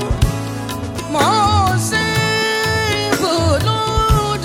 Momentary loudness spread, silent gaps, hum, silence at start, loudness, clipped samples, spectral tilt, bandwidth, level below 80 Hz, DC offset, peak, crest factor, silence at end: 10 LU; none; none; 0 s; -16 LUFS; under 0.1%; -4.5 dB/octave; 17 kHz; -28 dBFS; under 0.1%; -4 dBFS; 14 dB; 0 s